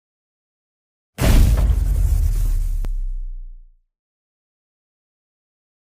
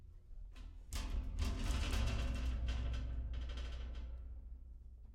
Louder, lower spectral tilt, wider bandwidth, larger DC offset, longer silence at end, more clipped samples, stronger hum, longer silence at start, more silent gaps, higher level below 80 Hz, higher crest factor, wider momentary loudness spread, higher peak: first, -21 LUFS vs -43 LUFS; about the same, -6 dB/octave vs -5 dB/octave; first, 16 kHz vs 14.5 kHz; neither; first, 2.25 s vs 0 s; neither; neither; first, 1.2 s vs 0 s; neither; first, -22 dBFS vs -42 dBFS; about the same, 18 dB vs 16 dB; first, 20 LU vs 17 LU; first, -4 dBFS vs -24 dBFS